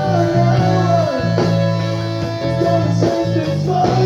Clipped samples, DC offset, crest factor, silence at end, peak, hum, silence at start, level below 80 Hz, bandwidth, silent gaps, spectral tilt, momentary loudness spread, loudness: under 0.1%; under 0.1%; 12 dB; 0 s; -2 dBFS; none; 0 s; -42 dBFS; 8 kHz; none; -7.5 dB/octave; 6 LU; -16 LUFS